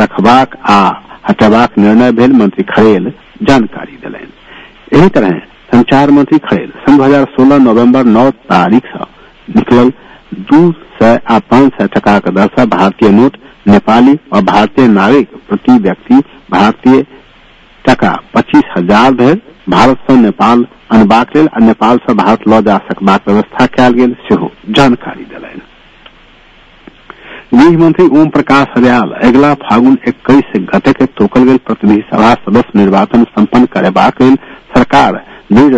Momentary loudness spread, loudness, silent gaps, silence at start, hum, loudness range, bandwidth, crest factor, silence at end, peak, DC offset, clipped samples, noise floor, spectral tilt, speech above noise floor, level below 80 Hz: 7 LU; -8 LUFS; none; 0 s; none; 3 LU; 8 kHz; 8 dB; 0 s; 0 dBFS; under 0.1%; 4%; -40 dBFS; -7 dB/octave; 33 dB; -36 dBFS